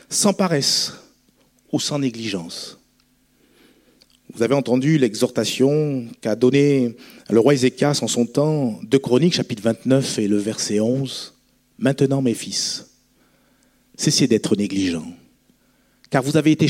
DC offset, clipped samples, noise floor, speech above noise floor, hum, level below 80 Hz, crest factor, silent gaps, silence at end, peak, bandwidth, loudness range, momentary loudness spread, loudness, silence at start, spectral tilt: under 0.1%; under 0.1%; -61 dBFS; 42 dB; none; -62 dBFS; 18 dB; none; 0 s; -2 dBFS; 16.5 kHz; 6 LU; 10 LU; -20 LUFS; 0.1 s; -5 dB/octave